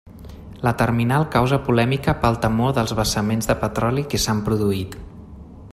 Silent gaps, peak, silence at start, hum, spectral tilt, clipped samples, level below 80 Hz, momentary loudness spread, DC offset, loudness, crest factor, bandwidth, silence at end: none; -4 dBFS; 0.05 s; none; -5.5 dB/octave; under 0.1%; -38 dBFS; 21 LU; under 0.1%; -20 LUFS; 18 dB; 15.5 kHz; 0 s